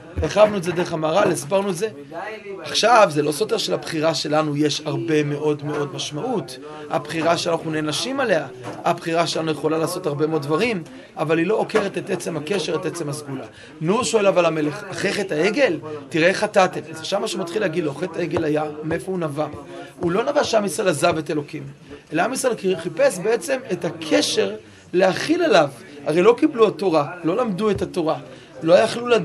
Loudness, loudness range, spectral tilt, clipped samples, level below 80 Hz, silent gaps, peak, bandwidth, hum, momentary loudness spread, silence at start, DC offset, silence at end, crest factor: -21 LUFS; 4 LU; -4.5 dB/octave; under 0.1%; -52 dBFS; none; -2 dBFS; 13 kHz; none; 11 LU; 0 s; under 0.1%; 0 s; 20 dB